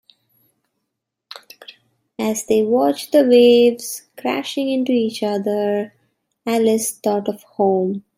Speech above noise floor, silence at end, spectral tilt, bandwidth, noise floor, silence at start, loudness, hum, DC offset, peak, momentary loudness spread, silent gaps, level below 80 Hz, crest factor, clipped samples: 61 dB; 0.15 s; -4.5 dB/octave; 16 kHz; -78 dBFS; 2.2 s; -18 LUFS; none; under 0.1%; -2 dBFS; 18 LU; none; -66 dBFS; 16 dB; under 0.1%